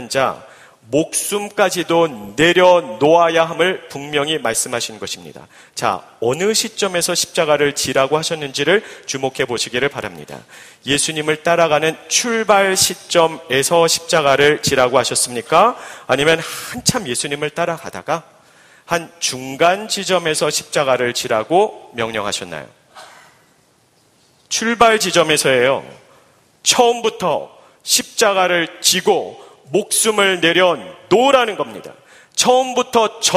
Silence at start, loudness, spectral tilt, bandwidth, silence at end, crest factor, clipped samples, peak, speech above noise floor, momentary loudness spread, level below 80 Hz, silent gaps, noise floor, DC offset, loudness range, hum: 0 s; -16 LUFS; -2.5 dB/octave; 15.5 kHz; 0 s; 18 dB; under 0.1%; 0 dBFS; 39 dB; 11 LU; -54 dBFS; none; -56 dBFS; under 0.1%; 5 LU; none